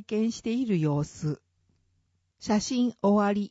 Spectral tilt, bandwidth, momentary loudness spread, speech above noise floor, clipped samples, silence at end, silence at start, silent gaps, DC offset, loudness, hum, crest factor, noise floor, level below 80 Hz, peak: -6.5 dB/octave; 8 kHz; 10 LU; 46 dB; under 0.1%; 0 s; 0 s; none; under 0.1%; -27 LUFS; none; 14 dB; -73 dBFS; -60 dBFS; -14 dBFS